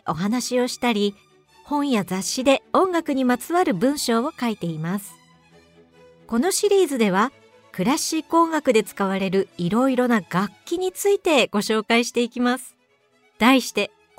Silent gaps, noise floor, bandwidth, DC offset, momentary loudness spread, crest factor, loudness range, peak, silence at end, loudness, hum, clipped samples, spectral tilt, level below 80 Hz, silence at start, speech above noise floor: none; -62 dBFS; 16 kHz; under 0.1%; 8 LU; 18 dB; 3 LU; -4 dBFS; 0.3 s; -21 LUFS; none; under 0.1%; -4 dB/octave; -60 dBFS; 0.05 s; 41 dB